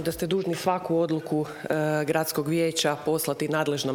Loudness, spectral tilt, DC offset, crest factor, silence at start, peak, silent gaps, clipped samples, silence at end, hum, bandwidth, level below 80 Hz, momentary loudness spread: -26 LUFS; -4.5 dB/octave; under 0.1%; 16 dB; 0 s; -10 dBFS; none; under 0.1%; 0 s; none; over 20 kHz; -60 dBFS; 3 LU